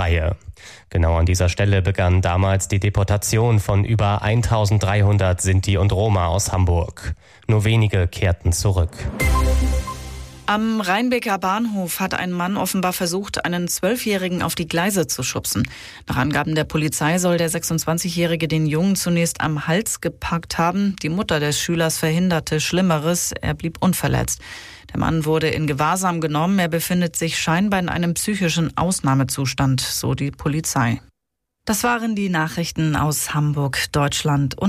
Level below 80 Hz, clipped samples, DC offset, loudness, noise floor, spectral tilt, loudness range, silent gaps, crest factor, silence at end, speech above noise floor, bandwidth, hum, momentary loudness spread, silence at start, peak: -32 dBFS; under 0.1%; under 0.1%; -20 LUFS; -80 dBFS; -5 dB/octave; 3 LU; none; 12 dB; 0 s; 60 dB; 15.5 kHz; none; 6 LU; 0 s; -8 dBFS